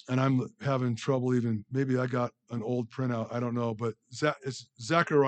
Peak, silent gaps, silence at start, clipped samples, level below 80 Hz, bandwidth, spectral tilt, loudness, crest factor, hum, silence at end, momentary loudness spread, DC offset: -12 dBFS; none; 0.1 s; under 0.1%; -74 dBFS; 8.8 kHz; -7 dB/octave; -31 LUFS; 18 dB; none; 0 s; 8 LU; under 0.1%